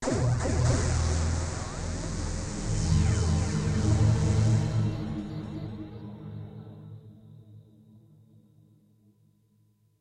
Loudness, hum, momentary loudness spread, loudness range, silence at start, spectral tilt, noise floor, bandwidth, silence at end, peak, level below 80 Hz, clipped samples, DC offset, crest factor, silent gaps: -28 LUFS; none; 18 LU; 18 LU; 0 s; -6 dB/octave; -66 dBFS; 10.5 kHz; 2.4 s; -12 dBFS; -38 dBFS; under 0.1%; under 0.1%; 16 dB; none